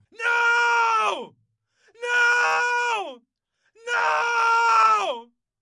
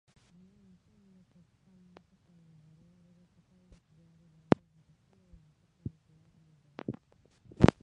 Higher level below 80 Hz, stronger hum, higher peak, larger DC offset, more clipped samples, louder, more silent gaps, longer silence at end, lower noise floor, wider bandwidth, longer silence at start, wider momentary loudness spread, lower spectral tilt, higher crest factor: second, -86 dBFS vs -50 dBFS; neither; second, -8 dBFS vs -2 dBFS; neither; neither; first, -20 LUFS vs -33 LUFS; neither; first, 0.4 s vs 0.15 s; first, -73 dBFS vs -66 dBFS; first, 12 kHz vs 10.5 kHz; second, 0.2 s vs 6.9 s; second, 15 LU vs 23 LU; second, 0.5 dB/octave vs -8 dB/octave; second, 16 dB vs 34 dB